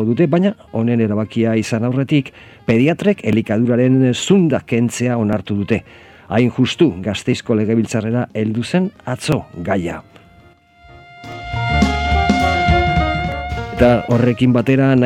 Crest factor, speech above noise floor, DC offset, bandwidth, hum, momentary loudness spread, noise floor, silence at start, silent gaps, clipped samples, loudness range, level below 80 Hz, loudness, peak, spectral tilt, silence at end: 16 dB; 32 dB; under 0.1%; 13 kHz; none; 8 LU; -48 dBFS; 0 s; none; under 0.1%; 6 LU; -32 dBFS; -17 LUFS; 0 dBFS; -6.5 dB/octave; 0 s